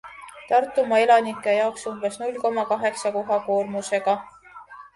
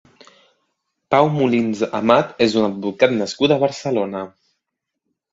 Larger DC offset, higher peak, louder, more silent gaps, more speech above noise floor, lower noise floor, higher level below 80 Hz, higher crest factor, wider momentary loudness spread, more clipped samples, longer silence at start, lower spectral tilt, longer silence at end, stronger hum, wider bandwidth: neither; second, -4 dBFS vs 0 dBFS; second, -23 LUFS vs -18 LUFS; neither; second, 22 dB vs 62 dB; second, -44 dBFS vs -79 dBFS; second, -68 dBFS vs -60 dBFS; about the same, 18 dB vs 20 dB; first, 11 LU vs 7 LU; neither; second, 0.05 s vs 1.1 s; second, -3.5 dB/octave vs -6 dB/octave; second, 0.15 s vs 1.05 s; neither; first, 11.5 kHz vs 7.8 kHz